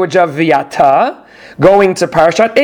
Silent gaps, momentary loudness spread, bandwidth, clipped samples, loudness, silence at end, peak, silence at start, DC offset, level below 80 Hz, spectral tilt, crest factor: none; 4 LU; 17 kHz; 0.7%; -10 LUFS; 0 s; 0 dBFS; 0 s; under 0.1%; -46 dBFS; -5.5 dB/octave; 10 dB